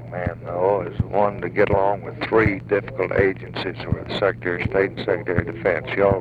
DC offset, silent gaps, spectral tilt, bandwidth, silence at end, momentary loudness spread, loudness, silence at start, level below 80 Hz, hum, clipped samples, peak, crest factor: under 0.1%; none; -8.5 dB/octave; 7.4 kHz; 0 s; 8 LU; -22 LUFS; 0 s; -42 dBFS; none; under 0.1%; -4 dBFS; 18 dB